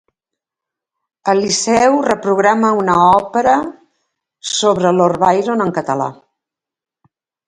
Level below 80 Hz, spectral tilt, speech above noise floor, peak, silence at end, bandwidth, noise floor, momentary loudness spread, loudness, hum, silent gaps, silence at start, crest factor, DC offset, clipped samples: -52 dBFS; -4 dB/octave; 74 dB; 0 dBFS; 1.35 s; 11.5 kHz; -87 dBFS; 9 LU; -14 LUFS; none; none; 1.25 s; 16 dB; under 0.1%; under 0.1%